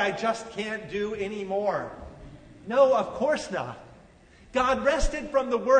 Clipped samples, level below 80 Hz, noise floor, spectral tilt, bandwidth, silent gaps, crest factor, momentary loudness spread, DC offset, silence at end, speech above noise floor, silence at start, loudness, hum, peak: under 0.1%; -40 dBFS; -54 dBFS; -4.5 dB/octave; 9.6 kHz; none; 18 dB; 18 LU; under 0.1%; 0 s; 28 dB; 0 s; -27 LUFS; none; -8 dBFS